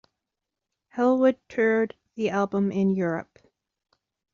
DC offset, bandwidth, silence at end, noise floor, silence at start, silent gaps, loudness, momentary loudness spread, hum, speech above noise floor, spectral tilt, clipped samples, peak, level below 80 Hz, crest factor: under 0.1%; 7.2 kHz; 1.1 s; -86 dBFS; 0.95 s; none; -25 LUFS; 10 LU; none; 62 dB; -6.5 dB/octave; under 0.1%; -10 dBFS; -70 dBFS; 18 dB